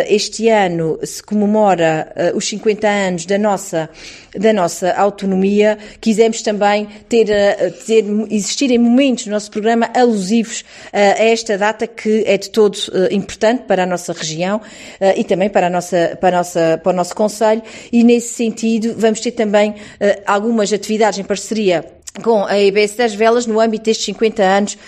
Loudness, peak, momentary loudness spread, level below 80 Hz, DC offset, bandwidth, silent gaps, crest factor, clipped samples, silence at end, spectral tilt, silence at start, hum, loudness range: -15 LUFS; 0 dBFS; 7 LU; -54 dBFS; under 0.1%; 14 kHz; none; 14 dB; under 0.1%; 0 s; -4.5 dB/octave; 0 s; none; 2 LU